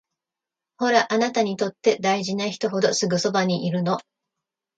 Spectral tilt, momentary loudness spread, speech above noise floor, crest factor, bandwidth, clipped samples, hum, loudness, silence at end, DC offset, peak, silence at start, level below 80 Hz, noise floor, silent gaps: -4.5 dB/octave; 6 LU; 66 dB; 18 dB; 9.2 kHz; under 0.1%; none; -22 LUFS; 0.75 s; under 0.1%; -4 dBFS; 0.8 s; -70 dBFS; -88 dBFS; none